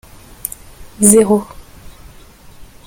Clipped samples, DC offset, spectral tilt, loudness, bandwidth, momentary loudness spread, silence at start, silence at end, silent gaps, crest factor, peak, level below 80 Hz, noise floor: 0.1%; under 0.1%; -5 dB/octave; -11 LUFS; 17 kHz; 24 LU; 0.8 s; 0.25 s; none; 18 dB; 0 dBFS; -42 dBFS; -40 dBFS